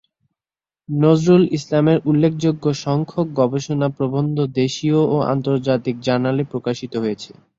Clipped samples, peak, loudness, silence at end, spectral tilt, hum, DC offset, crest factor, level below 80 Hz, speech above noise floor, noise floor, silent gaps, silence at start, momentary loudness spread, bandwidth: under 0.1%; -2 dBFS; -19 LUFS; 0.25 s; -7.5 dB/octave; none; under 0.1%; 16 dB; -56 dBFS; over 72 dB; under -90 dBFS; none; 0.9 s; 8 LU; 7.8 kHz